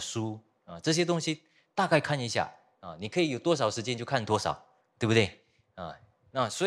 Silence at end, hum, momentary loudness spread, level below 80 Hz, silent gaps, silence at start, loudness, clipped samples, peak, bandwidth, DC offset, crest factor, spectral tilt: 0 s; none; 17 LU; -66 dBFS; none; 0 s; -30 LUFS; under 0.1%; -8 dBFS; 14 kHz; under 0.1%; 22 dB; -4.5 dB/octave